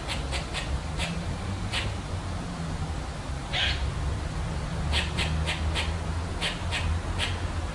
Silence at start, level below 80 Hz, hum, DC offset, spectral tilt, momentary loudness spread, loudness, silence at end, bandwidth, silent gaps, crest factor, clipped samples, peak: 0 s; -34 dBFS; none; under 0.1%; -4.5 dB/octave; 7 LU; -30 LUFS; 0 s; 11.5 kHz; none; 16 dB; under 0.1%; -12 dBFS